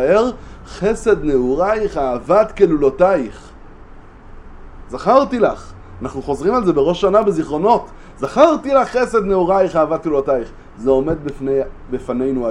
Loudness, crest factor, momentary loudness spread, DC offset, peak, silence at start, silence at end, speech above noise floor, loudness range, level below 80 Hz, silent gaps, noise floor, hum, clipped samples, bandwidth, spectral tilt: -16 LUFS; 16 dB; 12 LU; under 0.1%; 0 dBFS; 0 s; 0 s; 22 dB; 4 LU; -36 dBFS; none; -38 dBFS; none; under 0.1%; 10.5 kHz; -6.5 dB/octave